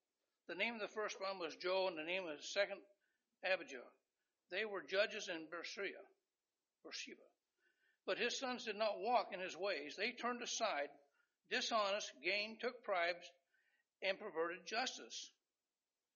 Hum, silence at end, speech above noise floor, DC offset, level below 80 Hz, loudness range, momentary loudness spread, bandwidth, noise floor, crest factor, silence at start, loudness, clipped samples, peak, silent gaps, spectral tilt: none; 0.85 s; over 47 dB; under 0.1%; under -90 dBFS; 4 LU; 11 LU; 7.2 kHz; under -90 dBFS; 22 dB; 0.5 s; -42 LUFS; under 0.1%; -22 dBFS; none; 0.5 dB/octave